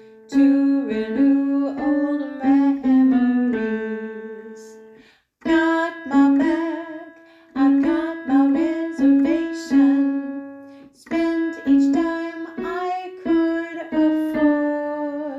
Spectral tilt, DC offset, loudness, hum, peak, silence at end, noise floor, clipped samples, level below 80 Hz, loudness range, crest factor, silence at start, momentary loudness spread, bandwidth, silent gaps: -6 dB/octave; under 0.1%; -20 LUFS; none; -6 dBFS; 0 s; -52 dBFS; under 0.1%; -58 dBFS; 3 LU; 14 dB; 0.3 s; 13 LU; 7.8 kHz; none